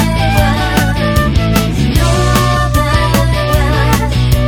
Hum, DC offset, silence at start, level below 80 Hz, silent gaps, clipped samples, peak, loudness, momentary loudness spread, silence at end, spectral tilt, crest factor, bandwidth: none; under 0.1%; 0 s; -16 dBFS; none; under 0.1%; 0 dBFS; -12 LUFS; 2 LU; 0 s; -5.5 dB/octave; 10 dB; over 20 kHz